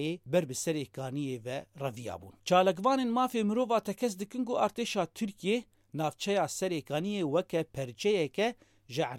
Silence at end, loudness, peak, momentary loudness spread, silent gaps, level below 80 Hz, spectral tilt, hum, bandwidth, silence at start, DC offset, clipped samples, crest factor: 0 s; -32 LUFS; -14 dBFS; 10 LU; none; -70 dBFS; -5 dB/octave; none; 16.5 kHz; 0 s; under 0.1%; under 0.1%; 18 dB